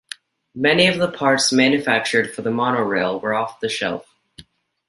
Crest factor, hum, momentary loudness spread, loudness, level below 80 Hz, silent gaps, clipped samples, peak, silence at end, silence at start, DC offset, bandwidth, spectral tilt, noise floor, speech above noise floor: 18 dB; none; 11 LU; -18 LUFS; -60 dBFS; none; under 0.1%; -2 dBFS; 0.5 s; 0.55 s; under 0.1%; 11.5 kHz; -3.5 dB/octave; -48 dBFS; 29 dB